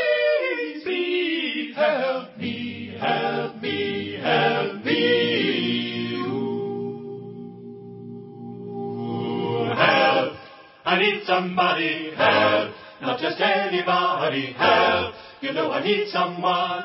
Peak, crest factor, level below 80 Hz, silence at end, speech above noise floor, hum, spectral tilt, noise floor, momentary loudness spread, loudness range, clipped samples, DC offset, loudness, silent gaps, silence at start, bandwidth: -4 dBFS; 20 dB; -60 dBFS; 0 s; 23 dB; none; -9 dB/octave; -45 dBFS; 16 LU; 7 LU; under 0.1%; under 0.1%; -22 LUFS; none; 0 s; 5.8 kHz